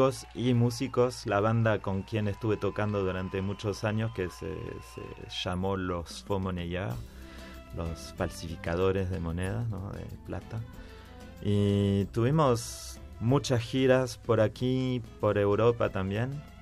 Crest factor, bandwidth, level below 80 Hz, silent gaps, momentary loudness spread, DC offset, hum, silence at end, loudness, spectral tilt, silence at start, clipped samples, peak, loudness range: 18 dB; 14.5 kHz; -50 dBFS; none; 15 LU; under 0.1%; none; 0 s; -30 LUFS; -6.5 dB/octave; 0 s; under 0.1%; -12 dBFS; 7 LU